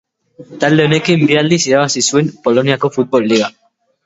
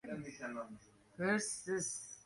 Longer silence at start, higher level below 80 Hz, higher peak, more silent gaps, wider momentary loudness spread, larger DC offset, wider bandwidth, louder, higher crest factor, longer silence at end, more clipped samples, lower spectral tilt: first, 0.4 s vs 0.05 s; first, -56 dBFS vs -76 dBFS; first, 0 dBFS vs -22 dBFS; neither; second, 4 LU vs 17 LU; neither; second, 8 kHz vs 11.5 kHz; first, -13 LUFS vs -40 LUFS; about the same, 14 dB vs 18 dB; first, 0.55 s vs 0.05 s; neither; about the same, -4.5 dB/octave vs -3.5 dB/octave